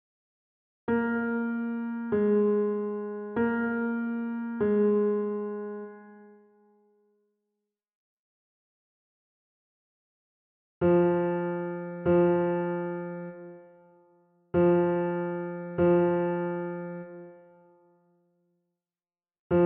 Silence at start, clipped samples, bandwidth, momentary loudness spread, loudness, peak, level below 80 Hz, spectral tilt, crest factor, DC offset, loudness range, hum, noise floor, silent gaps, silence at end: 0.9 s; under 0.1%; 3.5 kHz; 15 LU; -28 LUFS; -14 dBFS; -66 dBFS; -8.5 dB/octave; 16 dB; under 0.1%; 7 LU; none; under -90 dBFS; 7.95-10.81 s, 19.39-19.50 s; 0 s